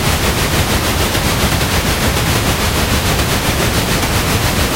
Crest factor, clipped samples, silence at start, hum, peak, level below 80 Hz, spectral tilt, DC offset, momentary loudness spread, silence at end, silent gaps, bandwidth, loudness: 14 dB; under 0.1%; 0 s; none; 0 dBFS; -22 dBFS; -3.5 dB/octave; under 0.1%; 0 LU; 0 s; none; 16 kHz; -14 LUFS